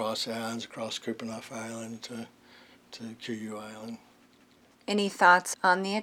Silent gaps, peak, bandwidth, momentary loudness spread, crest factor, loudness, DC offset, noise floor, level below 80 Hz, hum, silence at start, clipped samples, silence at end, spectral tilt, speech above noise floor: none; -6 dBFS; 17 kHz; 22 LU; 24 dB; -29 LUFS; under 0.1%; -61 dBFS; -80 dBFS; none; 0 s; under 0.1%; 0 s; -3 dB/octave; 31 dB